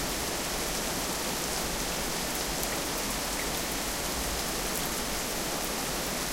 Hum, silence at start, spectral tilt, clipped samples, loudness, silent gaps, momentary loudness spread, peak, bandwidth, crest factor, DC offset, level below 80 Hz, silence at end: none; 0 s; -2 dB/octave; under 0.1%; -30 LUFS; none; 1 LU; -12 dBFS; 17 kHz; 20 dB; under 0.1%; -44 dBFS; 0 s